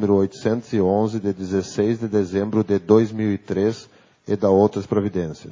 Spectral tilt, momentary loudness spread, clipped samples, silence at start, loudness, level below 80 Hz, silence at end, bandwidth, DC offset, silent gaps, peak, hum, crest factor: -7.5 dB/octave; 8 LU; under 0.1%; 0 s; -21 LUFS; -48 dBFS; 0 s; 7.6 kHz; under 0.1%; none; -2 dBFS; none; 18 dB